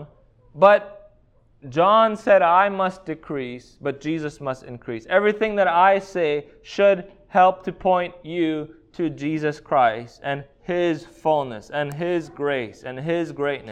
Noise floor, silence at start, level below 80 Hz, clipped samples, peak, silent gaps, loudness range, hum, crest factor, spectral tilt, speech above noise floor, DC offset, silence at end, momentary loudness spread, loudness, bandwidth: -57 dBFS; 0 s; -56 dBFS; under 0.1%; -2 dBFS; none; 5 LU; none; 20 dB; -6.5 dB/octave; 36 dB; under 0.1%; 0 s; 15 LU; -21 LUFS; 9.2 kHz